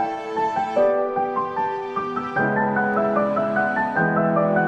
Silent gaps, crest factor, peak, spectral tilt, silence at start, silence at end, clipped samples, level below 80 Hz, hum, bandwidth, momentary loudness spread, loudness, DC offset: none; 14 dB; -8 dBFS; -8 dB/octave; 0 s; 0 s; under 0.1%; -60 dBFS; none; 8.4 kHz; 6 LU; -22 LUFS; under 0.1%